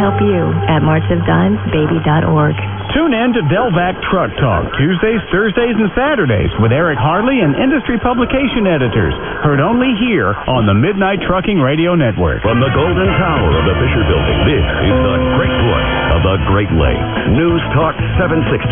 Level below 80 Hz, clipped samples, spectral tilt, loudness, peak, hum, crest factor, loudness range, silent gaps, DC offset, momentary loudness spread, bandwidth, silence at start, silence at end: -26 dBFS; under 0.1%; -11 dB/octave; -13 LUFS; 0 dBFS; none; 12 dB; 1 LU; none; under 0.1%; 2 LU; 3.8 kHz; 0 s; 0 s